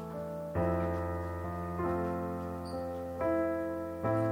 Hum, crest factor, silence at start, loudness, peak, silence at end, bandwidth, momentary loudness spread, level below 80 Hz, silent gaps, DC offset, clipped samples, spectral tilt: none; 14 dB; 0 s; -35 LUFS; -20 dBFS; 0 s; 16.5 kHz; 7 LU; -52 dBFS; none; under 0.1%; under 0.1%; -8.5 dB/octave